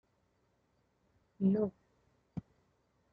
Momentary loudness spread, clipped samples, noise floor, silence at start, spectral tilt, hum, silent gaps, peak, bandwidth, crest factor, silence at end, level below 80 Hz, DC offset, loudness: 17 LU; under 0.1%; -76 dBFS; 1.4 s; -11.5 dB/octave; none; none; -20 dBFS; 3 kHz; 20 dB; 0.75 s; -72 dBFS; under 0.1%; -34 LUFS